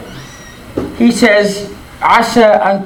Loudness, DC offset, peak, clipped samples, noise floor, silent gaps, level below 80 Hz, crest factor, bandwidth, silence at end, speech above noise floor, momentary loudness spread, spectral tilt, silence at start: -10 LUFS; under 0.1%; 0 dBFS; 0.3%; -32 dBFS; none; -40 dBFS; 12 dB; 17.5 kHz; 0 s; 23 dB; 21 LU; -4.5 dB/octave; 0 s